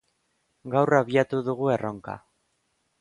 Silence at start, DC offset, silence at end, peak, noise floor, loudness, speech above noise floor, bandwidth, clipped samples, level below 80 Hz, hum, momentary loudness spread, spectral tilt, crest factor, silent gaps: 0.65 s; under 0.1%; 0.85 s; -6 dBFS; -73 dBFS; -24 LUFS; 49 dB; 11 kHz; under 0.1%; -66 dBFS; none; 18 LU; -7.5 dB/octave; 22 dB; none